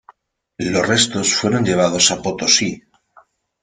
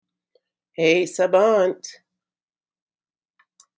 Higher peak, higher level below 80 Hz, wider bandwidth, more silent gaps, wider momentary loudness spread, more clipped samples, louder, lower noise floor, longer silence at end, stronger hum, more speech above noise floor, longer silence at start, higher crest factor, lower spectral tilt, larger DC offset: first, 0 dBFS vs -4 dBFS; first, -52 dBFS vs -84 dBFS; first, 11 kHz vs 8 kHz; neither; second, 9 LU vs 20 LU; neither; first, -16 LUFS vs -19 LUFS; second, -53 dBFS vs under -90 dBFS; second, 0.85 s vs 1.85 s; neither; second, 36 dB vs over 71 dB; second, 0.6 s vs 0.8 s; about the same, 18 dB vs 20 dB; second, -2.5 dB/octave vs -4.5 dB/octave; neither